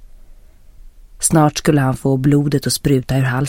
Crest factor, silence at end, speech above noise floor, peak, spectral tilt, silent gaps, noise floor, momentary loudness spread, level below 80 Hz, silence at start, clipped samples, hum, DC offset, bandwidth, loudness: 16 dB; 0 s; 26 dB; 0 dBFS; -5.5 dB/octave; none; -41 dBFS; 4 LU; -38 dBFS; 0 s; under 0.1%; none; under 0.1%; 16.5 kHz; -16 LUFS